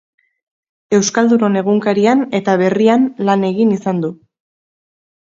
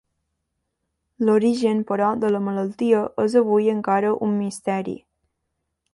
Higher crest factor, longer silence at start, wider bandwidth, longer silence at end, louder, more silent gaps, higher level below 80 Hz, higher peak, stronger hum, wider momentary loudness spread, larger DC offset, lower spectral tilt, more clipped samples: about the same, 16 dB vs 16 dB; second, 0.9 s vs 1.2 s; second, 7.8 kHz vs 11.5 kHz; first, 1.25 s vs 0.95 s; first, -14 LUFS vs -21 LUFS; neither; about the same, -62 dBFS vs -64 dBFS; first, 0 dBFS vs -6 dBFS; neither; about the same, 5 LU vs 7 LU; neither; second, -5.5 dB/octave vs -7 dB/octave; neither